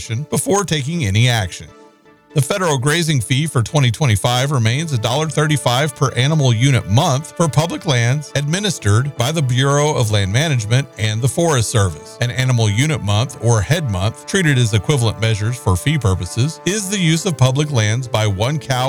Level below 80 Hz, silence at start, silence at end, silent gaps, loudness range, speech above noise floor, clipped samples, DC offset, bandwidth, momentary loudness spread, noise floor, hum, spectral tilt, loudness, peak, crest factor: -44 dBFS; 0 s; 0 s; none; 1 LU; 31 dB; under 0.1%; 0.2%; 16.5 kHz; 4 LU; -47 dBFS; none; -5 dB/octave; -17 LUFS; -2 dBFS; 14 dB